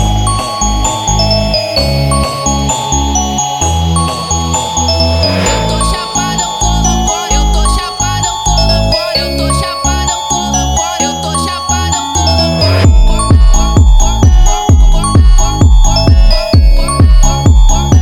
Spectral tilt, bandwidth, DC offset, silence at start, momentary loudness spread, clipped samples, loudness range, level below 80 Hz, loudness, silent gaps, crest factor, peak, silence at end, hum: -4 dB/octave; 16 kHz; under 0.1%; 0 s; 5 LU; under 0.1%; 3 LU; -12 dBFS; -10 LUFS; none; 8 dB; 0 dBFS; 0 s; none